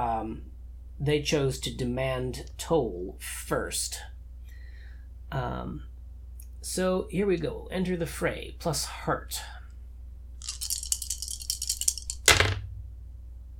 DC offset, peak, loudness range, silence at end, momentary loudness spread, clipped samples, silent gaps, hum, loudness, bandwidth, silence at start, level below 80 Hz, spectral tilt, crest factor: under 0.1%; 0 dBFS; 8 LU; 0 s; 20 LU; under 0.1%; none; none; -29 LUFS; 19 kHz; 0 s; -42 dBFS; -3.5 dB/octave; 32 dB